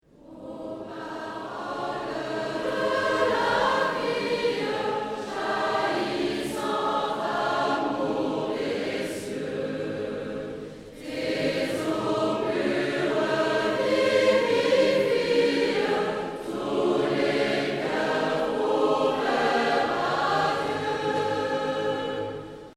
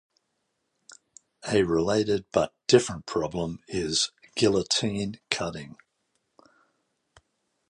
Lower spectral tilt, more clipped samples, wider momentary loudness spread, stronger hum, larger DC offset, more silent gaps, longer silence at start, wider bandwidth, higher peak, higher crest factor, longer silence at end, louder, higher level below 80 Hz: about the same, -4.5 dB/octave vs -4 dB/octave; neither; about the same, 11 LU vs 11 LU; neither; neither; neither; second, 0.25 s vs 0.9 s; first, 15 kHz vs 11.5 kHz; second, -10 dBFS vs -4 dBFS; second, 16 dB vs 26 dB; second, 0.05 s vs 2 s; about the same, -26 LUFS vs -26 LUFS; about the same, -58 dBFS vs -54 dBFS